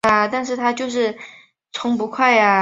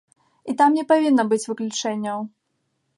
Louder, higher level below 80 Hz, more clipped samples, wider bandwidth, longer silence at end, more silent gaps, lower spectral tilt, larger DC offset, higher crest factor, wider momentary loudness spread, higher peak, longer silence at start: about the same, -19 LUFS vs -21 LUFS; first, -58 dBFS vs -76 dBFS; neither; about the same, 11 kHz vs 11.5 kHz; second, 0 s vs 0.7 s; neither; about the same, -4 dB/octave vs -4 dB/octave; neither; about the same, 18 dB vs 16 dB; first, 17 LU vs 14 LU; first, -2 dBFS vs -6 dBFS; second, 0.05 s vs 0.45 s